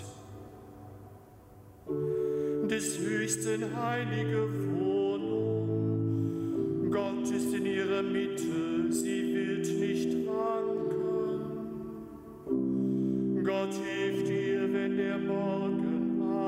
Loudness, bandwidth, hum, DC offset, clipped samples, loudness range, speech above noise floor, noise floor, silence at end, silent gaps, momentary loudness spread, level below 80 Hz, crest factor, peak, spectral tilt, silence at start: -31 LUFS; 16 kHz; none; under 0.1%; under 0.1%; 2 LU; 22 dB; -53 dBFS; 0 s; none; 10 LU; -64 dBFS; 14 dB; -18 dBFS; -6 dB/octave; 0 s